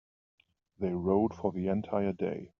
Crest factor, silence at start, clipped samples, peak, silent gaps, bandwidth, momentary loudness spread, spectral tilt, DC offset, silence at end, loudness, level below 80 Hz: 18 dB; 0.8 s; under 0.1%; -14 dBFS; none; 6.4 kHz; 7 LU; -8.5 dB/octave; under 0.1%; 0.15 s; -32 LUFS; -66 dBFS